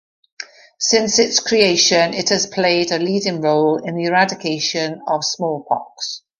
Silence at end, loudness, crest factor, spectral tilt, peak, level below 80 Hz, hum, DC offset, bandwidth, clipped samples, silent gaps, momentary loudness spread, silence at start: 0.2 s; -17 LUFS; 16 dB; -2.5 dB/octave; -2 dBFS; -60 dBFS; none; under 0.1%; 11 kHz; under 0.1%; none; 11 LU; 0.4 s